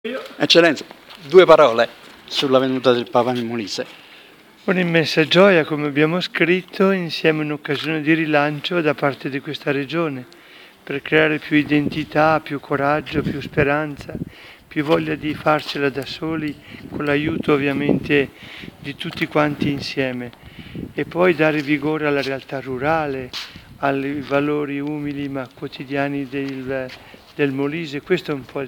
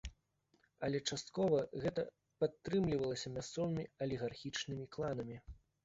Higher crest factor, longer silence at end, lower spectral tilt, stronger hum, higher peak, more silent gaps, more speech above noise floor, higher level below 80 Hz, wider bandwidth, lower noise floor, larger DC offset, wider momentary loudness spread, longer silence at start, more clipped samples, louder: about the same, 20 dB vs 18 dB; second, 0 s vs 0.25 s; about the same, -6 dB/octave vs -5.5 dB/octave; neither; first, 0 dBFS vs -22 dBFS; neither; second, 27 dB vs 39 dB; first, -52 dBFS vs -62 dBFS; first, 18.5 kHz vs 8 kHz; second, -46 dBFS vs -78 dBFS; neither; first, 15 LU vs 9 LU; about the same, 0.05 s vs 0.05 s; neither; first, -19 LUFS vs -40 LUFS